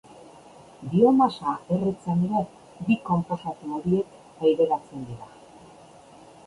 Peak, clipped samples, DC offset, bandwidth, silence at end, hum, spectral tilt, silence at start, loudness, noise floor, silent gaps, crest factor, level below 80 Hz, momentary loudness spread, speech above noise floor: -6 dBFS; under 0.1%; under 0.1%; 11.5 kHz; 1.2 s; none; -8.5 dB/octave; 0.8 s; -25 LUFS; -49 dBFS; none; 18 dB; -60 dBFS; 18 LU; 26 dB